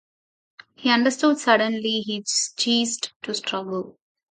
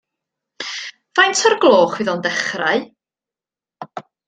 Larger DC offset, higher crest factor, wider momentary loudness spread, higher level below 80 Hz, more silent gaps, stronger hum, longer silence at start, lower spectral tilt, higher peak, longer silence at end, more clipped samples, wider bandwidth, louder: neither; about the same, 22 dB vs 18 dB; second, 10 LU vs 19 LU; second, -74 dBFS vs -66 dBFS; first, 3.16-3.20 s vs none; neither; first, 0.8 s vs 0.6 s; about the same, -2 dB/octave vs -2.5 dB/octave; about the same, -2 dBFS vs 0 dBFS; first, 0.4 s vs 0.25 s; neither; about the same, 9.6 kHz vs 9.4 kHz; second, -22 LUFS vs -16 LUFS